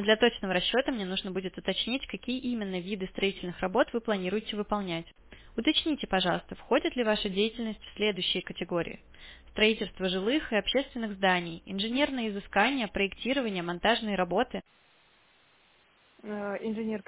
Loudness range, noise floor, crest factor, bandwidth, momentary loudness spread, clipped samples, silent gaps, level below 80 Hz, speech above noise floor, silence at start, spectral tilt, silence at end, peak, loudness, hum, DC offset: 3 LU; -64 dBFS; 20 dB; 4 kHz; 9 LU; under 0.1%; none; -56 dBFS; 34 dB; 0 s; -2.5 dB/octave; 0.05 s; -10 dBFS; -30 LUFS; none; under 0.1%